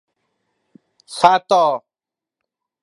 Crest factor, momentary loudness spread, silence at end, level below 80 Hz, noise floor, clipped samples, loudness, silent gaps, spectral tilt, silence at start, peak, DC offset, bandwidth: 20 dB; 15 LU; 1.05 s; -64 dBFS; -88 dBFS; under 0.1%; -15 LUFS; none; -3.5 dB/octave; 1.1 s; 0 dBFS; under 0.1%; 11.5 kHz